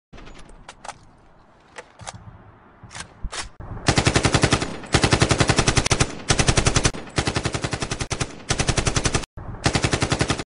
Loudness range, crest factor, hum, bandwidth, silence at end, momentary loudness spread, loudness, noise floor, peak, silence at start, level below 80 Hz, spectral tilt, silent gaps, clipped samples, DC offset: 18 LU; 20 dB; none; 11 kHz; 0 s; 20 LU; -21 LUFS; -51 dBFS; -2 dBFS; 0.15 s; -32 dBFS; -3.5 dB/octave; 9.26-9.37 s; under 0.1%; under 0.1%